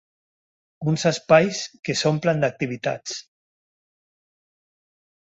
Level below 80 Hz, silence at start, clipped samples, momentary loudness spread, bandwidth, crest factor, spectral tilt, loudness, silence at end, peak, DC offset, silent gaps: -62 dBFS; 0.8 s; under 0.1%; 13 LU; 8.2 kHz; 22 dB; -5 dB/octave; -22 LUFS; 2.1 s; -4 dBFS; under 0.1%; 1.79-1.83 s